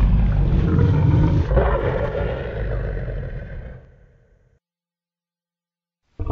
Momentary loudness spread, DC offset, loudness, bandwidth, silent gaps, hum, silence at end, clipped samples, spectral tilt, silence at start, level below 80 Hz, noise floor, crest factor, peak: 17 LU; under 0.1%; -20 LUFS; 5 kHz; none; none; 0 s; under 0.1%; -10 dB/octave; 0 s; -24 dBFS; under -90 dBFS; 18 dB; -4 dBFS